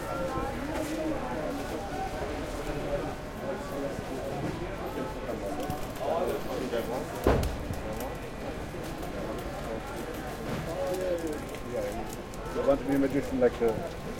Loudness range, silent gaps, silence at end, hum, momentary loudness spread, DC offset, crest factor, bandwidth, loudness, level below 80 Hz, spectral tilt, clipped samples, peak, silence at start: 5 LU; none; 0 s; none; 9 LU; under 0.1%; 22 dB; 17 kHz; -33 LUFS; -42 dBFS; -6 dB/octave; under 0.1%; -10 dBFS; 0 s